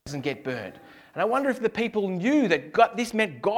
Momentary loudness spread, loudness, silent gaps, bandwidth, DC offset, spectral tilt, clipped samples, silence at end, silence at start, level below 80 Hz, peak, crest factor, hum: 11 LU; -25 LUFS; none; 16 kHz; under 0.1%; -5.5 dB/octave; under 0.1%; 0 s; 0.05 s; -64 dBFS; -6 dBFS; 20 dB; none